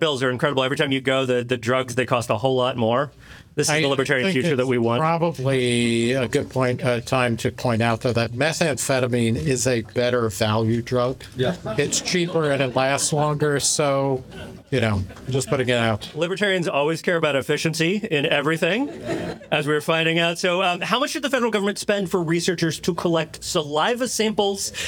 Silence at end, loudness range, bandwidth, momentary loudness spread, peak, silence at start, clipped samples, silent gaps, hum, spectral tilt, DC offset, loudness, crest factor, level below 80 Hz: 0 s; 1 LU; 19.5 kHz; 5 LU; -2 dBFS; 0 s; under 0.1%; none; none; -4.5 dB/octave; under 0.1%; -21 LUFS; 20 dB; -54 dBFS